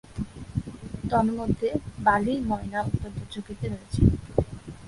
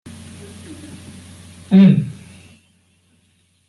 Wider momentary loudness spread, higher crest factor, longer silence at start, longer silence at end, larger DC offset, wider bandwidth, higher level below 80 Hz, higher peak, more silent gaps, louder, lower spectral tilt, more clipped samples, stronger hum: second, 13 LU vs 28 LU; about the same, 22 dB vs 18 dB; second, 0.1 s vs 0.7 s; second, 0 s vs 1.6 s; neither; about the same, 11.5 kHz vs 11.5 kHz; first, -38 dBFS vs -60 dBFS; about the same, -4 dBFS vs -2 dBFS; neither; second, -27 LUFS vs -14 LUFS; about the same, -7.5 dB/octave vs -8 dB/octave; neither; neither